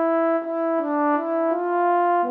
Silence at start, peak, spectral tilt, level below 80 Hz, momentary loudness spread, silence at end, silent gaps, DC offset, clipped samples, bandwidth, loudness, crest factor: 0 s; -10 dBFS; -7.5 dB/octave; under -90 dBFS; 4 LU; 0 s; none; under 0.1%; under 0.1%; 4.2 kHz; -22 LUFS; 10 dB